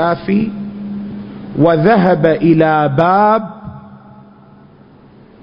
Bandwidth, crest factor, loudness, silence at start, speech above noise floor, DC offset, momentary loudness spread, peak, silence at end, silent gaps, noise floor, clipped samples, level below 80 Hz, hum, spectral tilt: 5.4 kHz; 14 dB; -12 LUFS; 0 s; 31 dB; under 0.1%; 17 LU; 0 dBFS; 1.45 s; none; -42 dBFS; under 0.1%; -48 dBFS; none; -10.5 dB/octave